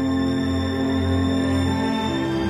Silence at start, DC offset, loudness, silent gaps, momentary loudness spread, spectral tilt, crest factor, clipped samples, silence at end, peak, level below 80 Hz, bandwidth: 0 s; under 0.1%; -22 LUFS; none; 2 LU; -6.5 dB/octave; 12 dB; under 0.1%; 0 s; -10 dBFS; -40 dBFS; 13 kHz